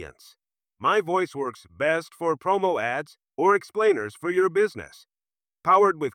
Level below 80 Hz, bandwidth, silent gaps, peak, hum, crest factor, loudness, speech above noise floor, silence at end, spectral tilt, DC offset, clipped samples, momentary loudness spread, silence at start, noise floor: -68 dBFS; 14 kHz; none; -8 dBFS; none; 16 dB; -24 LUFS; over 66 dB; 0.05 s; -5.5 dB/octave; under 0.1%; under 0.1%; 12 LU; 0 s; under -90 dBFS